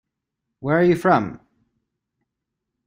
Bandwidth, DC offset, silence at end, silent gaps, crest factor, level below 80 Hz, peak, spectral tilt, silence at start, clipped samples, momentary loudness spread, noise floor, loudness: 15.5 kHz; under 0.1%; 1.5 s; none; 20 dB; -60 dBFS; -4 dBFS; -8 dB/octave; 0.6 s; under 0.1%; 15 LU; -82 dBFS; -19 LUFS